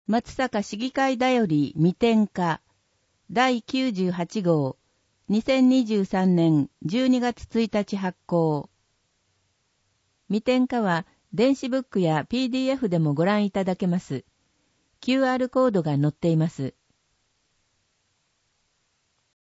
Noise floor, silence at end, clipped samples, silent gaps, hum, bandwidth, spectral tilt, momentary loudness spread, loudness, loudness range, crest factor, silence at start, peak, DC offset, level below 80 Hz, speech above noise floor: -71 dBFS; 2.7 s; under 0.1%; none; none; 8 kHz; -7 dB/octave; 8 LU; -24 LUFS; 5 LU; 18 dB; 0.1 s; -8 dBFS; under 0.1%; -60 dBFS; 48 dB